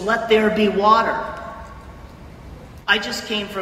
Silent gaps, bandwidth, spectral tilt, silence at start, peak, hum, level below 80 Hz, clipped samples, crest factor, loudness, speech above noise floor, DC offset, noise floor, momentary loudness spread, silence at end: none; 16 kHz; -4.5 dB/octave; 0 s; -2 dBFS; none; -44 dBFS; under 0.1%; 18 dB; -18 LUFS; 21 dB; under 0.1%; -39 dBFS; 24 LU; 0 s